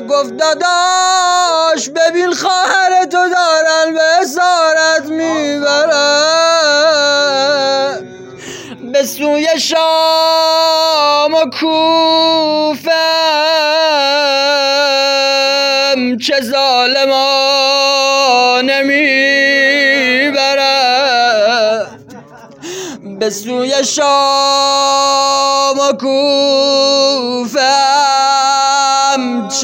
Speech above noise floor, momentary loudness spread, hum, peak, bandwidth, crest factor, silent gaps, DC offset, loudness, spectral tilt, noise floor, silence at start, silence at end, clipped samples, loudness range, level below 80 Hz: 24 dB; 6 LU; none; 0 dBFS; 16.5 kHz; 12 dB; none; under 0.1%; -11 LUFS; -1 dB/octave; -35 dBFS; 0 s; 0 s; under 0.1%; 4 LU; -68 dBFS